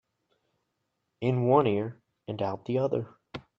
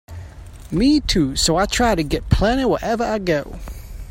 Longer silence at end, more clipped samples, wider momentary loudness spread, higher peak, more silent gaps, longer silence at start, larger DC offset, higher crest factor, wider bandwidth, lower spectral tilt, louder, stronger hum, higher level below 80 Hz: first, 0.2 s vs 0 s; neither; about the same, 18 LU vs 19 LU; second, -8 dBFS vs 0 dBFS; neither; first, 1.2 s vs 0.1 s; neither; about the same, 22 dB vs 18 dB; second, 6.6 kHz vs 16.5 kHz; first, -9.5 dB/octave vs -4.5 dB/octave; second, -28 LUFS vs -19 LUFS; neither; second, -68 dBFS vs -30 dBFS